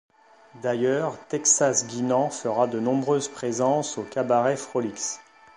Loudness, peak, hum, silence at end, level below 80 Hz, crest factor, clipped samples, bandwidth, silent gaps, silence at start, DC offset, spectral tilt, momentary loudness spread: -24 LUFS; -6 dBFS; none; 0.35 s; -72 dBFS; 20 dB; under 0.1%; 11 kHz; none; 0.55 s; under 0.1%; -4 dB/octave; 9 LU